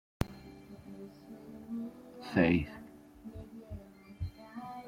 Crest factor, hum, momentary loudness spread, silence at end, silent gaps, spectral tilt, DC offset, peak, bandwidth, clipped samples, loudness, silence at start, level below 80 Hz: 24 dB; none; 23 LU; 0 s; none; -7.5 dB/octave; under 0.1%; -14 dBFS; 16.5 kHz; under 0.1%; -35 LUFS; 0.2 s; -54 dBFS